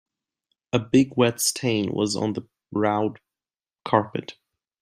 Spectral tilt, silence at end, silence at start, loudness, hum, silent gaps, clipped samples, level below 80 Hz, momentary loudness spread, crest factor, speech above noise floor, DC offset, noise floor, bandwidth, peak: -4.5 dB/octave; 0.5 s; 0.75 s; -24 LUFS; none; none; under 0.1%; -62 dBFS; 13 LU; 22 dB; over 67 dB; under 0.1%; under -90 dBFS; 16 kHz; -4 dBFS